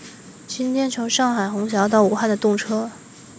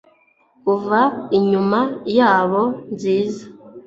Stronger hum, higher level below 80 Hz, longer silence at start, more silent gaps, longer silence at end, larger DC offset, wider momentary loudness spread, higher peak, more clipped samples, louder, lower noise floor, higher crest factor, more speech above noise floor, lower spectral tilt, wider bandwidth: neither; about the same, -62 dBFS vs -62 dBFS; second, 0 s vs 0.65 s; neither; about the same, 0 s vs 0.05 s; neither; first, 16 LU vs 10 LU; about the same, -4 dBFS vs -2 dBFS; neither; about the same, -20 LUFS vs -18 LUFS; second, -41 dBFS vs -57 dBFS; about the same, 18 dB vs 16 dB; second, 21 dB vs 40 dB; second, -4 dB/octave vs -7 dB/octave; about the same, 8 kHz vs 7.8 kHz